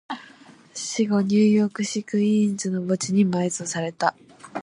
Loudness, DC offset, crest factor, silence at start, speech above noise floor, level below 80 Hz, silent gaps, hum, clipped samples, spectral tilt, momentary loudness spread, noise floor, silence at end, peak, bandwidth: -23 LUFS; under 0.1%; 18 dB; 0.1 s; 28 dB; -68 dBFS; none; none; under 0.1%; -5.5 dB/octave; 14 LU; -49 dBFS; 0 s; -4 dBFS; 11 kHz